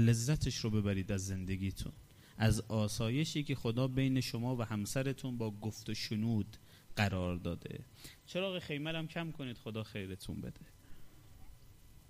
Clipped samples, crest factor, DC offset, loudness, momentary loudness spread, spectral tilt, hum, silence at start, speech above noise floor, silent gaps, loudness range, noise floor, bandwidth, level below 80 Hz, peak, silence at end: under 0.1%; 18 dB; under 0.1%; -37 LUFS; 13 LU; -5.5 dB/octave; none; 0 s; 22 dB; none; 7 LU; -58 dBFS; 15.5 kHz; -54 dBFS; -18 dBFS; 0.1 s